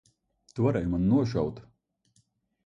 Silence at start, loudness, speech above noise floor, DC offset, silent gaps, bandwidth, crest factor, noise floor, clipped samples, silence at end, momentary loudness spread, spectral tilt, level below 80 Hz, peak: 0.55 s; -27 LUFS; 44 dB; under 0.1%; none; 7.8 kHz; 18 dB; -70 dBFS; under 0.1%; 1.05 s; 15 LU; -9 dB/octave; -50 dBFS; -12 dBFS